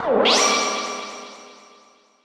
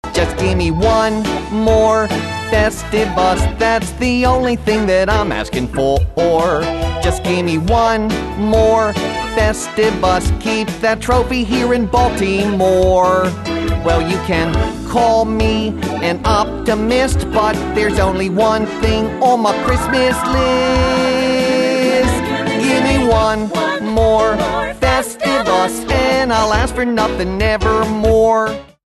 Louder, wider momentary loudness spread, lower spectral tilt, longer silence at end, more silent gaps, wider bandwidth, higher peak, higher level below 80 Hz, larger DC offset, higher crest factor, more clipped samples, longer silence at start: second, -19 LUFS vs -15 LUFS; first, 21 LU vs 5 LU; second, -1 dB/octave vs -5.5 dB/octave; first, 0.7 s vs 0.35 s; neither; first, 15 kHz vs 12.5 kHz; second, -6 dBFS vs -2 dBFS; second, -62 dBFS vs -26 dBFS; neither; about the same, 18 dB vs 14 dB; neither; about the same, 0 s vs 0.05 s